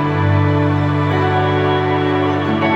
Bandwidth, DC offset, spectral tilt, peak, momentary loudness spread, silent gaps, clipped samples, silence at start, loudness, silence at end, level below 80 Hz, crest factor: 7.4 kHz; under 0.1%; -8.5 dB/octave; -4 dBFS; 2 LU; none; under 0.1%; 0 s; -16 LUFS; 0 s; -48 dBFS; 12 dB